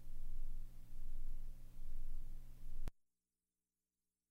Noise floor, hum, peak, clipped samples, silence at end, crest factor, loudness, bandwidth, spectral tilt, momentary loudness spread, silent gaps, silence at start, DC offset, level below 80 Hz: under -90 dBFS; 60 Hz at -65 dBFS; -32 dBFS; under 0.1%; 1.4 s; 10 dB; -56 LUFS; 1.4 kHz; -6 dB/octave; 6 LU; none; 0 s; under 0.1%; -44 dBFS